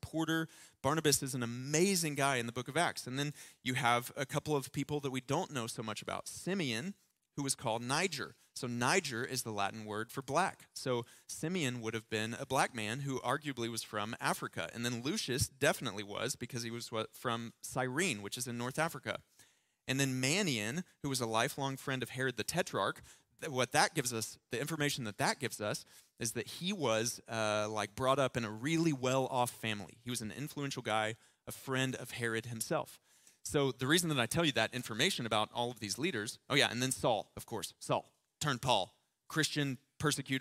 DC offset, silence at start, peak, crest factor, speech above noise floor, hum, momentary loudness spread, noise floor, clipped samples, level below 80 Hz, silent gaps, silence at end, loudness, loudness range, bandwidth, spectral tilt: under 0.1%; 0.05 s; -14 dBFS; 24 dB; 32 dB; none; 10 LU; -68 dBFS; under 0.1%; -68 dBFS; none; 0 s; -36 LUFS; 4 LU; 16 kHz; -3.5 dB/octave